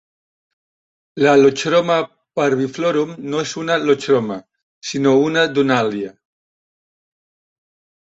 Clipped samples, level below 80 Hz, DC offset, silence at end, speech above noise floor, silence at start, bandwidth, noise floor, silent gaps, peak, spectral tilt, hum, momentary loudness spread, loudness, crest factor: under 0.1%; -62 dBFS; under 0.1%; 2 s; over 74 dB; 1.15 s; 8 kHz; under -90 dBFS; 4.63-4.81 s; -2 dBFS; -5 dB/octave; none; 14 LU; -17 LUFS; 18 dB